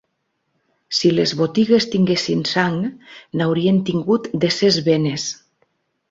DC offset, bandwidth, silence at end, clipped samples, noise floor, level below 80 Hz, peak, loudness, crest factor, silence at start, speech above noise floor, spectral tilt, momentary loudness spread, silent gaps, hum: under 0.1%; 7.8 kHz; 0.75 s; under 0.1%; -72 dBFS; -58 dBFS; -2 dBFS; -18 LUFS; 18 dB; 0.9 s; 54 dB; -5.5 dB/octave; 9 LU; none; none